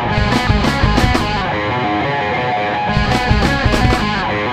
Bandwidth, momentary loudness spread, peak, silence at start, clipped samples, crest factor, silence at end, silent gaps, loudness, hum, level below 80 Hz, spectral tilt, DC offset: 15.5 kHz; 3 LU; 0 dBFS; 0 s; under 0.1%; 14 dB; 0 s; none; -15 LUFS; none; -22 dBFS; -5.5 dB/octave; under 0.1%